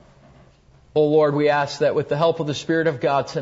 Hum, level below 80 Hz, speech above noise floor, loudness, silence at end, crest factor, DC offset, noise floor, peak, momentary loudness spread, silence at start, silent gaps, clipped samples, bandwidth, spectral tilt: none; -58 dBFS; 33 dB; -20 LUFS; 0 s; 14 dB; under 0.1%; -53 dBFS; -6 dBFS; 5 LU; 0.95 s; none; under 0.1%; 8 kHz; -6 dB/octave